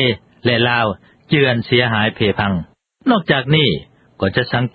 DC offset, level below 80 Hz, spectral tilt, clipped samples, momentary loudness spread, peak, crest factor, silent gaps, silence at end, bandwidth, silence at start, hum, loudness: under 0.1%; -44 dBFS; -9.5 dB/octave; under 0.1%; 8 LU; 0 dBFS; 16 dB; none; 0.05 s; 5 kHz; 0 s; none; -16 LUFS